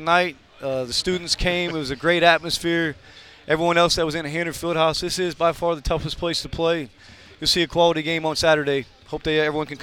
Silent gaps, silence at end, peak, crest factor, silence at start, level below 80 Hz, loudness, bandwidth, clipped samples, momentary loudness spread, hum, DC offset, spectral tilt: none; 0 s; 0 dBFS; 22 dB; 0 s; -42 dBFS; -21 LUFS; 17.5 kHz; under 0.1%; 9 LU; none; under 0.1%; -4 dB/octave